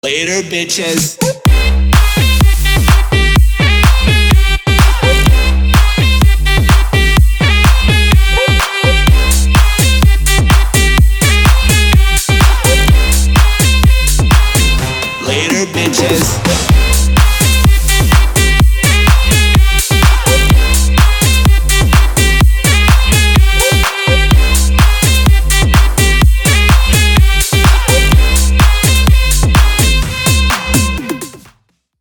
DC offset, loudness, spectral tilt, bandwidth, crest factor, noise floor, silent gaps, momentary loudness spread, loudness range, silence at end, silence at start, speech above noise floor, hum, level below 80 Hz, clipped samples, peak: under 0.1%; -10 LUFS; -4 dB/octave; 20 kHz; 8 dB; -55 dBFS; none; 3 LU; 2 LU; 0.65 s; 0.05 s; 40 dB; none; -10 dBFS; under 0.1%; 0 dBFS